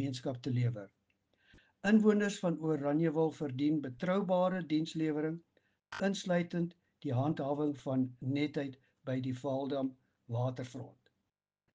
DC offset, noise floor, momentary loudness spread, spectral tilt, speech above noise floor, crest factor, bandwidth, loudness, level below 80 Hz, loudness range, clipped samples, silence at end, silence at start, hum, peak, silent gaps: under 0.1%; -87 dBFS; 12 LU; -7 dB/octave; 54 dB; 20 dB; 9.4 kHz; -34 LUFS; -74 dBFS; 5 LU; under 0.1%; 0.85 s; 0 s; none; -16 dBFS; none